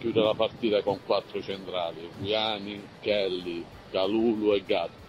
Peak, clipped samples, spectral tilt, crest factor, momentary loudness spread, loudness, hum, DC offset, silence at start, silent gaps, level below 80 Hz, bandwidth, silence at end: -10 dBFS; under 0.1%; -6.5 dB/octave; 20 dB; 10 LU; -28 LUFS; none; under 0.1%; 0 s; none; -60 dBFS; 12 kHz; 0 s